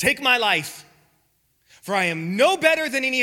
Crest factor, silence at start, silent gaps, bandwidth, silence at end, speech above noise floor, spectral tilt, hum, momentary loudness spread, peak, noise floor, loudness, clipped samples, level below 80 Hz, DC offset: 20 dB; 0 s; none; 17.5 kHz; 0 s; 45 dB; -3 dB/octave; none; 9 LU; -2 dBFS; -66 dBFS; -20 LUFS; under 0.1%; -62 dBFS; under 0.1%